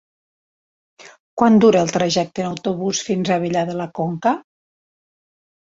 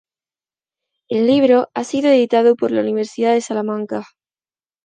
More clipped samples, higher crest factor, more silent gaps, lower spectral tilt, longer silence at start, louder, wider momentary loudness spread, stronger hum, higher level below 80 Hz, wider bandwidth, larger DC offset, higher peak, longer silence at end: neither; about the same, 18 dB vs 14 dB; first, 1.20-1.37 s vs none; about the same, -5 dB/octave vs -5 dB/octave; about the same, 1.05 s vs 1.1 s; second, -19 LUFS vs -16 LUFS; about the same, 12 LU vs 10 LU; neither; first, -58 dBFS vs -66 dBFS; second, 8 kHz vs 9.6 kHz; neither; about the same, -2 dBFS vs -2 dBFS; first, 1.2 s vs 0.8 s